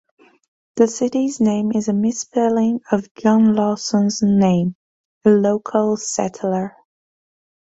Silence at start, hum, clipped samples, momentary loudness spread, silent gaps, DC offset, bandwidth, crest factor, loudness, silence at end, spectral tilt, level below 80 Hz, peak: 0.75 s; none; under 0.1%; 7 LU; 3.11-3.15 s, 4.75-5.21 s; under 0.1%; 8 kHz; 16 dB; -18 LUFS; 1.1 s; -6 dB/octave; -58 dBFS; -2 dBFS